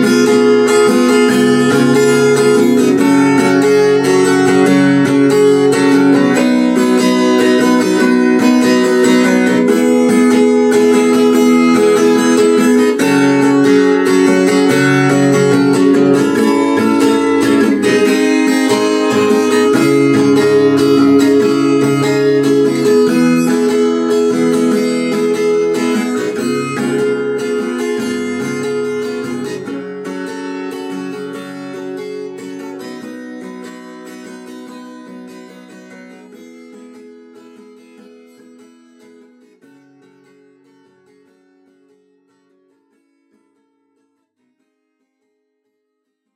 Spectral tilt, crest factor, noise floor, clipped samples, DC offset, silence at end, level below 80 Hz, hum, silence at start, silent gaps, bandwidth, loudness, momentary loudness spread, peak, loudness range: -5.5 dB/octave; 12 dB; -72 dBFS; under 0.1%; under 0.1%; 9.9 s; -60 dBFS; none; 0 s; none; 15.5 kHz; -11 LUFS; 16 LU; 0 dBFS; 15 LU